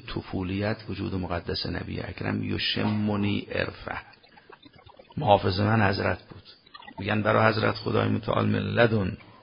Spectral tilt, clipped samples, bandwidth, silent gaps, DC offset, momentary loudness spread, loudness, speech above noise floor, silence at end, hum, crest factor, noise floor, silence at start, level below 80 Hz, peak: -10.5 dB/octave; under 0.1%; 5.4 kHz; none; under 0.1%; 13 LU; -26 LUFS; 26 dB; 0.1 s; none; 22 dB; -52 dBFS; 0.05 s; -46 dBFS; -4 dBFS